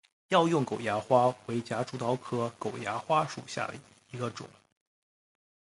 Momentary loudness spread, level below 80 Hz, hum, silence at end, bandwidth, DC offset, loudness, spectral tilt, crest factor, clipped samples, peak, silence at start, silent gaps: 13 LU; -70 dBFS; none; 1.2 s; 11.5 kHz; under 0.1%; -30 LUFS; -5.5 dB/octave; 22 dB; under 0.1%; -10 dBFS; 0.3 s; none